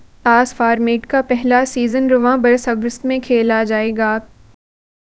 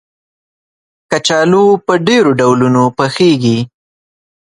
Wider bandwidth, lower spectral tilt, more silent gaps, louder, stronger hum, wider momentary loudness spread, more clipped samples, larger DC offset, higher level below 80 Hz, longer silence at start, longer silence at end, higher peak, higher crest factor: second, 8 kHz vs 11.5 kHz; about the same, -4.5 dB/octave vs -5.5 dB/octave; neither; second, -15 LUFS vs -11 LUFS; neither; about the same, 6 LU vs 7 LU; neither; neither; about the same, -48 dBFS vs -52 dBFS; second, 0.25 s vs 1.1 s; about the same, 0.9 s vs 0.95 s; about the same, 0 dBFS vs 0 dBFS; about the same, 16 dB vs 12 dB